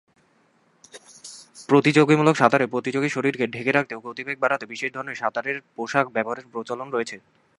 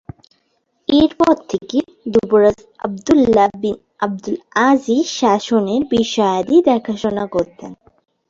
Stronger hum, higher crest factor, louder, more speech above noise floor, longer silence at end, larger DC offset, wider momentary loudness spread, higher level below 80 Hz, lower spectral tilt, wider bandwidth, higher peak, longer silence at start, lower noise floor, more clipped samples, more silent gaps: neither; first, 24 dB vs 16 dB; second, -23 LUFS vs -16 LUFS; second, 40 dB vs 50 dB; second, 0.4 s vs 0.55 s; neither; first, 16 LU vs 12 LU; second, -72 dBFS vs -48 dBFS; about the same, -5.5 dB/octave vs -5 dB/octave; first, 11.5 kHz vs 7.8 kHz; about the same, 0 dBFS vs 0 dBFS; about the same, 0.95 s vs 0.9 s; about the same, -62 dBFS vs -65 dBFS; neither; neither